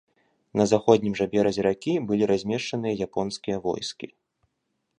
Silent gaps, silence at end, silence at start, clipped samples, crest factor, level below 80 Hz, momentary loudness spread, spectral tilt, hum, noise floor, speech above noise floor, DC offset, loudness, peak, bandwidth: none; 0.95 s; 0.55 s; under 0.1%; 22 dB; -58 dBFS; 10 LU; -5.5 dB/octave; none; -77 dBFS; 53 dB; under 0.1%; -25 LUFS; -4 dBFS; 10 kHz